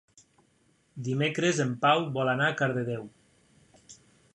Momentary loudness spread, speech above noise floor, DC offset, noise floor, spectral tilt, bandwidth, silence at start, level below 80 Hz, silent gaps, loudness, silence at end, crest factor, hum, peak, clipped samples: 14 LU; 40 dB; under 0.1%; -67 dBFS; -5 dB/octave; 10.5 kHz; 0.95 s; -72 dBFS; none; -27 LUFS; 0.4 s; 20 dB; none; -10 dBFS; under 0.1%